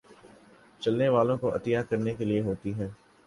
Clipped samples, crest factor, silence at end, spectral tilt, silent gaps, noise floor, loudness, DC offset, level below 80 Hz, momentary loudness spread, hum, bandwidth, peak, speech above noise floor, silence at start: under 0.1%; 18 dB; 0.3 s; -8 dB/octave; none; -56 dBFS; -28 LUFS; under 0.1%; -58 dBFS; 10 LU; none; 11.5 kHz; -12 dBFS; 29 dB; 0.1 s